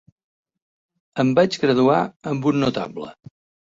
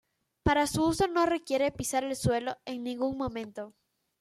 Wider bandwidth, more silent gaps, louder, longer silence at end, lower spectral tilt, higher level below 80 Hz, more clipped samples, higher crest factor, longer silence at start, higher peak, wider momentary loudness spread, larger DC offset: second, 7.8 kHz vs 14.5 kHz; first, 2.16-2.20 s vs none; first, -20 LUFS vs -30 LUFS; about the same, 0.55 s vs 0.5 s; first, -6.5 dB/octave vs -5 dB/octave; second, -58 dBFS vs -50 dBFS; neither; about the same, 18 dB vs 18 dB; first, 1.15 s vs 0.45 s; first, -4 dBFS vs -12 dBFS; first, 15 LU vs 11 LU; neither